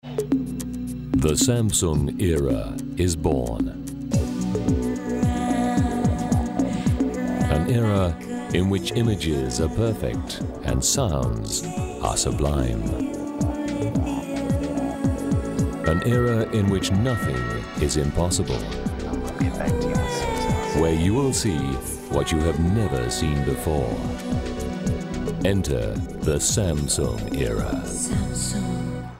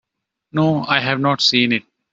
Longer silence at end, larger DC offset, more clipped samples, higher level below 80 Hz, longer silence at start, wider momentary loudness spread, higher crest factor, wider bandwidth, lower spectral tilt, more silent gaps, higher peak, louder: second, 0 s vs 0.3 s; neither; neither; first, -34 dBFS vs -60 dBFS; second, 0.05 s vs 0.55 s; about the same, 7 LU vs 7 LU; about the same, 16 dB vs 18 dB; first, 16 kHz vs 8 kHz; about the same, -5.5 dB/octave vs -4.5 dB/octave; neither; second, -6 dBFS vs -2 dBFS; second, -24 LUFS vs -17 LUFS